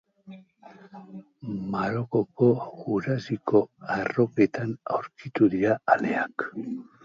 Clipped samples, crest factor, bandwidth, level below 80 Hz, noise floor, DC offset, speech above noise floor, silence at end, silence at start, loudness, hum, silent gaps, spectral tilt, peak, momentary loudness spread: under 0.1%; 22 dB; 7.4 kHz; -64 dBFS; -51 dBFS; under 0.1%; 25 dB; 0.2 s; 0.25 s; -26 LUFS; none; none; -8.5 dB/octave; -6 dBFS; 13 LU